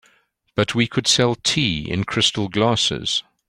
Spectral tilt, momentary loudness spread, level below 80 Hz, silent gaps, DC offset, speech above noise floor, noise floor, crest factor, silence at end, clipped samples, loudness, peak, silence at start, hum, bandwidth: -3.5 dB/octave; 7 LU; -48 dBFS; none; under 0.1%; 41 dB; -61 dBFS; 18 dB; 0.25 s; under 0.1%; -19 LUFS; -2 dBFS; 0.55 s; none; 16 kHz